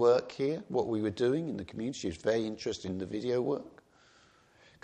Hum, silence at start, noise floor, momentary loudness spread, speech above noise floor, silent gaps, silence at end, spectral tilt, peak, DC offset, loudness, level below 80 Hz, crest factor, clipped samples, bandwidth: none; 0 s; -63 dBFS; 8 LU; 31 dB; none; 1.15 s; -6 dB/octave; -14 dBFS; under 0.1%; -33 LUFS; -66 dBFS; 18 dB; under 0.1%; 9.6 kHz